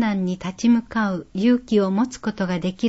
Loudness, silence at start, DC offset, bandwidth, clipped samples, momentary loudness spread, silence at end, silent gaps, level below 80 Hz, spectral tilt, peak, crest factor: -22 LUFS; 0 s; under 0.1%; 8 kHz; under 0.1%; 6 LU; 0 s; none; -52 dBFS; -6.5 dB/octave; -8 dBFS; 14 dB